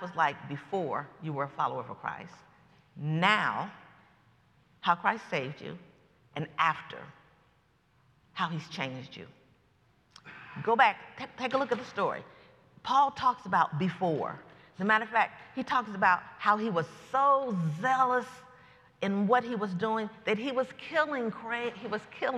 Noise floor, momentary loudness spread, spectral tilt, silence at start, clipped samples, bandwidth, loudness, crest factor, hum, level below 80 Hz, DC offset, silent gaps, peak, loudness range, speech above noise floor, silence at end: -68 dBFS; 17 LU; -6 dB/octave; 0 s; under 0.1%; 12 kHz; -30 LUFS; 24 dB; none; -74 dBFS; under 0.1%; none; -8 dBFS; 8 LU; 37 dB; 0 s